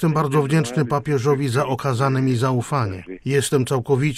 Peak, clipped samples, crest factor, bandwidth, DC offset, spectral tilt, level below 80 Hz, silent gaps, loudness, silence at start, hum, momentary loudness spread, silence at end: -6 dBFS; under 0.1%; 14 dB; 15 kHz; under 0.1%; -6.5 dB/octave; -52 dBFS; none; -20 LUFS; 0 s; none; 4 LU; 0 s